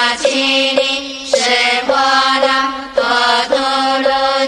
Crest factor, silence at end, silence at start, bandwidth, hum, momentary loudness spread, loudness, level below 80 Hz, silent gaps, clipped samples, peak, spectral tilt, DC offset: 14 dB; 0 s; 0 s; 12 kHz; none; 5 LU; -13 LUFS; -50 dBFS; none; under 0.1%; 0 dBFS; -0.5 dB/octave; under 0.1%